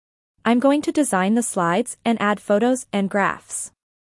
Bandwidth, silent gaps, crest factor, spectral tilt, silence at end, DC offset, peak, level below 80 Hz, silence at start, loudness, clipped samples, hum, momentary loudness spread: 12 kHz; none; 16 dB; -4.5 dB/octave; 0.45 s; under 0.1%; -6 dBFS; -66 dBFS; 0.45 s; -21 LUFS; under 0.1%; none; 9 LU